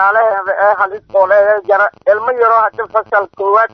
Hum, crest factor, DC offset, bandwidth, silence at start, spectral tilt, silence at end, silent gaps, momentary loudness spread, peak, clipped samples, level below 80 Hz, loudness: none; 12 dB; under 0.1%; 6 kHz; 0 s; -5.5 dB/octave; 0.05 s; none; 4 LU; 0 dBFS; under 0.1%; -60 dBFS; -12 LUFS